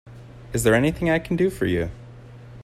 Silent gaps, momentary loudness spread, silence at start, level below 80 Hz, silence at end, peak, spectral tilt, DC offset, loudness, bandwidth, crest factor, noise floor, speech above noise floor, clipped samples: none; 24 LU; 0.05 s; -42 dBFS; 0 s; -6 dBFS; -6 dB/octave; under 0.1%; -22 LUFS; 15.5 kHz; 18 dB; -42 dBFS; 21 dB; under 0.1%